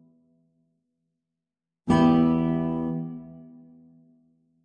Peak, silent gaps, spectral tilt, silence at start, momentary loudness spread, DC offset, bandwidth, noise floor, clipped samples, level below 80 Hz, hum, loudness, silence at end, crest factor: -8 dBFS; none; -8.5 dB/octave; 1.9 s; 20 LU; under 0.1%; 8.8 kHz; -88 dBFS; under 0.1%; -54 dBFS; none; -23 LUFS; 1.2 s; 18 dB